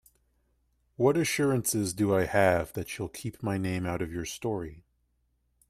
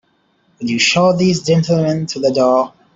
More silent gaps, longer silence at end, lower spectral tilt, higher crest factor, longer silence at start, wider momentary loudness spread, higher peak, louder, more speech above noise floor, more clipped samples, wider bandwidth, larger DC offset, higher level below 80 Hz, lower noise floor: neither; first, 0.9 s vs 0.25 s; about the same, -5 dB/octave vs -5 dB/octave; first, 20 dB vs 14 dB; first, 1 s vs 0.6 s; first, 11 LU vs 6 LU; second, -10 dBFS vs -2 dBFS; second, -29 LUFS vs -14 LUFS; about the same, 45 dB vs 45 dB; neither; first, 15.5 kHz vs 7.8 kHz; neither; about the same, -56 dBFS vs -54 dBFS; first, -73 dBFS vs -59 dBFS